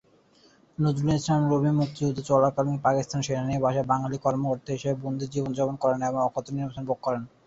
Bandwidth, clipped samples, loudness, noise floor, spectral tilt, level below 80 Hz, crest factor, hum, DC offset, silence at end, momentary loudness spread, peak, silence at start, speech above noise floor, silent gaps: 8 kHz; under 0.1%; -26 LUFS; -59 dBFS; -7 dB/octave; -56 dBFS; 18 dB; none; under 0.1%; 0.2 s; 7 LU; -8 dBFS; 0.8 s; 34 dB; none